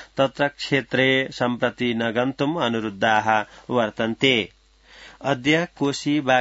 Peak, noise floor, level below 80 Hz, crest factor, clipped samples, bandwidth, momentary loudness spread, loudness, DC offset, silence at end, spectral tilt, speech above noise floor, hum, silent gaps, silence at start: -2 dBFS; -49 dBFS; -58 dBFS; 20 dB; under 0.1%; 8 kHz; 6 LU; -22 LUFS; under 0.1%; 0 s; -5 dB/octave; 28 dB; none; none; 0 s